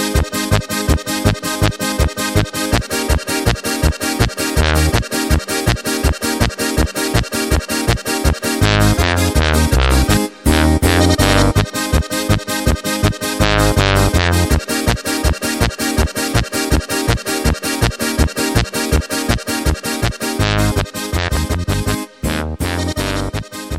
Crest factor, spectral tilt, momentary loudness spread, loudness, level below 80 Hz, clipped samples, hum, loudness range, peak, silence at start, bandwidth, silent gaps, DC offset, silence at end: 16 dB; -4.5 dB/octave; 6 LU; -16 LUFS; -22 dBFS; under 0.1%; none; 4 LU; 0 dBFS; 0 s; 16.5 kHz; none; under 0.1%; 0 s